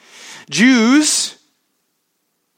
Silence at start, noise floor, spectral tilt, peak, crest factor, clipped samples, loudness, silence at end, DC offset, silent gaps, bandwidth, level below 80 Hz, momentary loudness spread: 0.25 s; -69 dBFS; -2.5 dB/octave; -2 dBFS; 16 dB; under 0.1%; -13 LUFS; 1.25 s; under 0.1%; none; 16.5 kHz; -72 dBFS; 22 LU